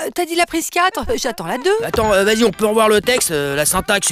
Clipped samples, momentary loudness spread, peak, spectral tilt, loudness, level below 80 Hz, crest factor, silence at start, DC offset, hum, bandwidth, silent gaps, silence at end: under 0.1%; 7 LU; -2 dBFS; -2.5 dB/octave; -16 LUFS; -40 dBFS; 14 dB; 0 s; under 0.1%; none; 16 kHz; none; 0 s